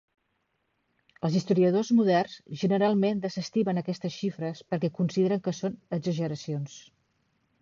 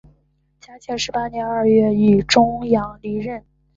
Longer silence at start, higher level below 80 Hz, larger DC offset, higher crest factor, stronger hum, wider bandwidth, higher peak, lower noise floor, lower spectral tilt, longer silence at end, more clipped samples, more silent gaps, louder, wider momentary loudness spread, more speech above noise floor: first, 1.25 s vs 0.7 s; second, -70 dBFS vs -46 dBFS; neither; about the same, 16 dB vs 18 dB; neither; about the same, 7.4 kHz vs 7.8 kHz; second, -14 dBFS vs -2 dBFS; first, -76 dBFS vs -62 dBFS; first, -7 dB/octave vs -5.5 dB/octave; first, 0.8 s vs 0.4 s; neither; neither; second, -28 LUFS vs -18 LUFS; second, 10 LU vs 15 LU; first, 49 dB vs 44 dB